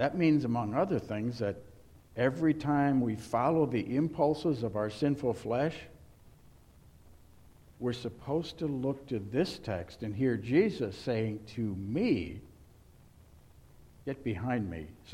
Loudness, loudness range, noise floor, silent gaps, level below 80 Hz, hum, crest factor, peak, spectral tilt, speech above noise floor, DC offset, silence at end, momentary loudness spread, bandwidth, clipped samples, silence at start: -32 LUFS; 8 LU; -58 dBFS; none; -58 dBFS; none; 18 dB; -14 dBFS; -7.5 dB/octave; 27 dB; under 0.1%; 0 s; 11 LU; 13 kHz; under 0.1%; 0 s